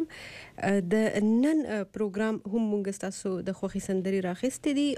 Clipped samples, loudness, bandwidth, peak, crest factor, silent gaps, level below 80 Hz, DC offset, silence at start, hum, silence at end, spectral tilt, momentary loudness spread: under 0.1%; -29 LUFS; 14 kHz; -16 dBFS; 14 dB; none; -60 dBFS; under 0.1%; 0 s; none; 0 s; -6 dB/octave; 9 LU